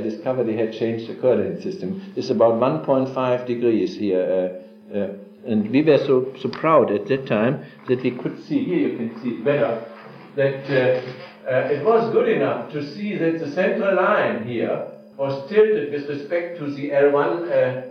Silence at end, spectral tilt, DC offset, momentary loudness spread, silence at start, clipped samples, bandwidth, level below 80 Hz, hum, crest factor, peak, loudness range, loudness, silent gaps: 0 s; -8 dB/octave; under 0.1%; 11 LU; 0 s; under 0.1%; 6.6 kHz; -70 dBFS; none; 18 dB; -2 dBFS; 3 LU; -21 LUFS; none